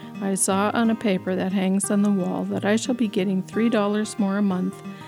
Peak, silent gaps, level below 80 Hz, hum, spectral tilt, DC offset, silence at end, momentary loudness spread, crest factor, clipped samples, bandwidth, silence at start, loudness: -8 dBFS; none; -70 dBFS; none; -5 dB/octave; under 0.1%; 0 s; 4 LU; 14 dB; under 0.1%; 15 kHz; 0 s; -23 LUFS